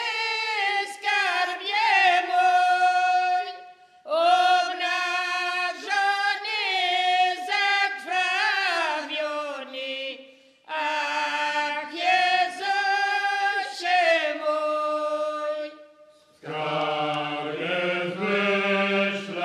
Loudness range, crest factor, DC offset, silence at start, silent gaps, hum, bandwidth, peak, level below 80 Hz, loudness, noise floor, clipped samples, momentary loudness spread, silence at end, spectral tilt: 6 LU; 16 dB; under 0.1%; 0 s; none; none; 13 kHz; -8 dBFS; -84 dBFS; -23 LUFS; -55 dBFS; under 0.1%; 9 LU; 0 s; -3 dB/octave